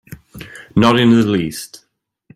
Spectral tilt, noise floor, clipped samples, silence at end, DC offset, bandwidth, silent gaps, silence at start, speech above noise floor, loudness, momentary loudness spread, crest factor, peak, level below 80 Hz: -6 dB/octave; -50 dBFS; under 0.1%; 0.6 s; under 0.1%; 15.5 kHz; none; 0.1 s; 37 dB; -14 LUFS; 23 LU; 16 dB; 0 dBFS; -48 dBFS